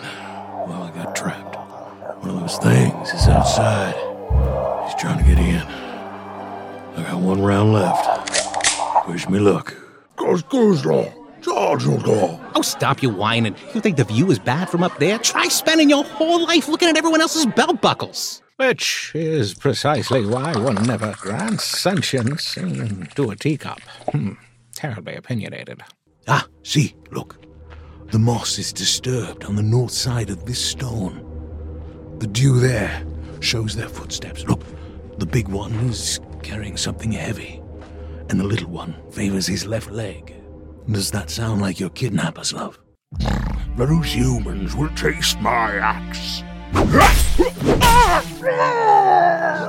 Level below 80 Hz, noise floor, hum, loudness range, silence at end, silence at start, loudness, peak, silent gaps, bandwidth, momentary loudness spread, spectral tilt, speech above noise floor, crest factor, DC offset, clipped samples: -30 dBFS; -40 dBFS; none; 9 LU; 0 s; 0 s; -19 LUFS; 0 dBFS; none; 16.5 kHz; 17 LU; -4.5 dB/octave; 21 dB; 20 dB; under 0.1%; under 0.1%